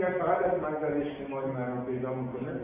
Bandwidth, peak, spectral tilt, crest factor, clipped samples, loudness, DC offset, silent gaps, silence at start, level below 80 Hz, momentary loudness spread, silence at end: 3.7 kHz; -14 dBFS; -7 dB/octave; 16 dB; under 0.1%; -31 LUFS; under 0.1%; none; 0 s; -60 dBFS; 7 LU; 0 s